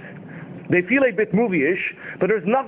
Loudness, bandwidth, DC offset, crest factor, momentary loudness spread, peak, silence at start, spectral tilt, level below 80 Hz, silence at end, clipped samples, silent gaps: -20 LUFS; 4 kHz; under 0.1%; 16 dB; 19 LU; -6 dBFS; 0 s; -10.5 dB/octave; -60 dBFS; 0 s; under 0.1%; none